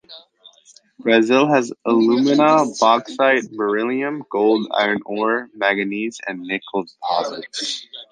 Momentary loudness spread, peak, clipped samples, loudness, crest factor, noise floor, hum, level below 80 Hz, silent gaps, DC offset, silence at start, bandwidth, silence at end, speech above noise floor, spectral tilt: 11 LU; 0 dBFS; under 0.1%; -19 LUFS; 18 dB; -51 dBFS; none; -70 dBFS; none; under 0.1%; 0.1 s; 9.6 kHz; 0.1 s; 33 dB; -4.5 dB/octave